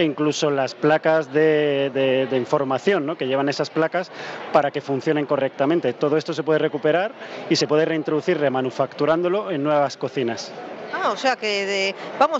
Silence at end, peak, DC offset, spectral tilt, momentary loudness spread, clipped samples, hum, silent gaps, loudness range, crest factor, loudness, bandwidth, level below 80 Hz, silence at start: 0 s; -4 dBFS; under 0.1%; -5 dB/octave; 6 LU; under 0.1%; none; none; 2 LU; 16 dB; -21 LUFS; 8 kHz; -72 dBFS; 0 s